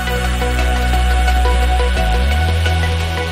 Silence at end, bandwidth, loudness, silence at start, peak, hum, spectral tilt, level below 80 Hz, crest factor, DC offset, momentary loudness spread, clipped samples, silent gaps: 0 s; 15 kHz; -16 LUFS; 0 s; -4 dBFS; none; -5 dB/octave; -16 dBFS; 12 dB; under 0.1%; 3 LU; under 0.1%; none